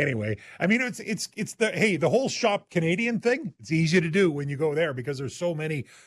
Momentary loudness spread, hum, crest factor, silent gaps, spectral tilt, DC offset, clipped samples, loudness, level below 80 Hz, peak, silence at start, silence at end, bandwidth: 9 LU; none; 16 dB; none; -5.5 dB/octave; under 0.1%; under 0.1%; -26 LUFS; -64 dBFS; -10 dBFS; 0 s; 0.25 s; 13 kHz